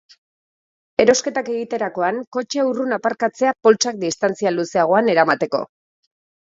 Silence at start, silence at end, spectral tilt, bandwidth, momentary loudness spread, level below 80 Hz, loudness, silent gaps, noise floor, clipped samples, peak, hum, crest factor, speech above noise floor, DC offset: 1 s; 0.8 s; -3.5 dB/octave; 7.8 kHz; 9 LU; -64 dBFS; -19 LUFS; 2.27-2.32 s; under -90 dBFS; under 0.1%; 0 dBFS; none; 20 dB; over 72 dB; under 0.1%